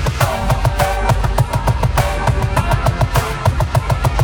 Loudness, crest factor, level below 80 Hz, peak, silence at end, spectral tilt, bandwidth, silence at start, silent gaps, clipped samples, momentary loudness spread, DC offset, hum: -17 LUFS; 14 dB; -20 dBFS; 0 dBFS; 0 s; -5.5 dB/octave; over 20 kHz; 0 s; none; under 0.1%; 2 LU; under 0.1%; none